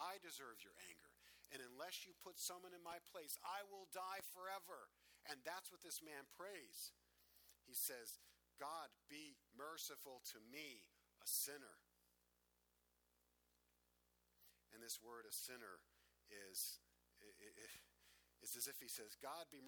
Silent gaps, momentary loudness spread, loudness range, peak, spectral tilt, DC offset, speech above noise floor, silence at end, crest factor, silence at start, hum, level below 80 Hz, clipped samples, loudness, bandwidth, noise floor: none; 15 LU; 5 LU; -30 dBFS; 0 dB/octave; under 0.1%; 29 dB; 0 s; 26 dB; 0 s; 60 Hz at -90 dBFS; -90 dBFS; under 0.1%; -52 LUFS; over 20 kHz; -84 dBFS